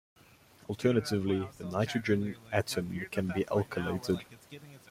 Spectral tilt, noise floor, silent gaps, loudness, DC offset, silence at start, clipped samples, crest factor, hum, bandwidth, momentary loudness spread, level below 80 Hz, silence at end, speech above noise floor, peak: -6 dB/octave; -59 dBFS; none; -32 LUFS; under 0.1%; 0.7 s; under 0.1%; 20 dB; none; 16.5 kHz; 19 LU; -62 dBFS; 0.15 s; 27 dB; -14 dBFS